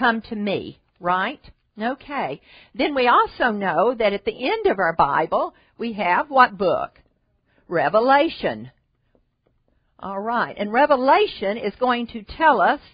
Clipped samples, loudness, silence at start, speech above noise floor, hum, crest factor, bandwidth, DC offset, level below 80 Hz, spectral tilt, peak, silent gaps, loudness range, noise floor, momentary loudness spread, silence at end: under 0.1%; -21 LUFS; 0 s; 46 dB; none; 22 dB; 5.2 kHz; under 0.1%; -54 dBFS; -9.5 dB/octave; 0 dBFS; none; 3 LU; -66 dBFS; 14 LU; 0.15 s